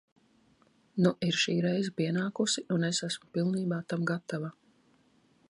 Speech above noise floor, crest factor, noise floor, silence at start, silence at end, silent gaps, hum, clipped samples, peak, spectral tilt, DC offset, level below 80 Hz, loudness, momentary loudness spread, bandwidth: 36 dB; 20 dB; -66 dBFS; 0.95 s; 1 s; none; none; under 0.1%; -12 dBFS; -5 dB/octave; under 0.1%; -74 dBFS; -31 LUFS; 8 LU; 11.5 kHz